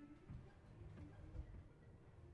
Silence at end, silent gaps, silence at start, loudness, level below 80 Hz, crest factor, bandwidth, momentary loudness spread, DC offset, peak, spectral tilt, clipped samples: 0 s; none; 0 s; -60 LUFS; -62 dBFS; 16 dB; 9.4 kHz; 8 LU; under 0.1%; -42 dBFS; -8.5 dB/octave; under 0.1%